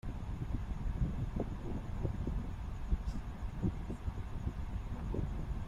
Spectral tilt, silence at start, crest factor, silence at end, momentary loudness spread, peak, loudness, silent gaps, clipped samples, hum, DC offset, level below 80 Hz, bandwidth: -8.5 dB/octave; 0.05 s; 18 dB; 0 s; 5 LU; -20 dBFS; -41 LUFS; none; under 0.1%; none; under 0.1%; -40 dBFS; 11 kHz